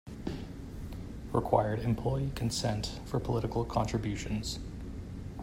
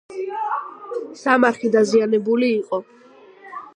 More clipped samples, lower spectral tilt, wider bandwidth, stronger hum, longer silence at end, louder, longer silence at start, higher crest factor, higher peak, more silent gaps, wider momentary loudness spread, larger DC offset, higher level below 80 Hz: neither; about the same, -6 dB/octave vs -5 dB/octave; first, 16 kHz vs 10 kHz; neither; about the same, 0 s vs 0.05 s; second, -34 LUFS vs -20 LUFS; about the same, 0.05 s vs 0.1 s; about the same, 22 dB vs 20 dB; second, -12 dBFS vs -2 dBFS; neither; about the same, 14 LU vs 14 LU; neither; first, -44 dBFS vs -76 dBFS